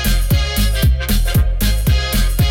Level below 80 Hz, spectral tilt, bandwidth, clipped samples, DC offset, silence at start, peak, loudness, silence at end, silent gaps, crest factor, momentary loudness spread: -16 dBFS; -4.5 dB/octave; 17 kHz; under 0.1%; under 0.1%; 0 s; -6 dBFS; -16 LUFS; 0 s; none; 8 dB; 2 LU